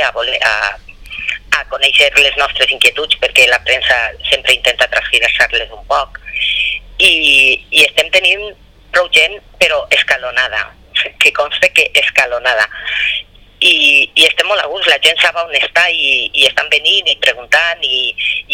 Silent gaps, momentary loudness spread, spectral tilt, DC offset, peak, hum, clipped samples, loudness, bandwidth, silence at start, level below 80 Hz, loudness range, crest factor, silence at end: none; 9 LU; 0 dB/octave; under 0.1%; 0 dBFS; none; 0.5%; -10 LUFS; over 20 kHz; 0 s; -40 dBFS; 2 LU; 12 dB; 0 s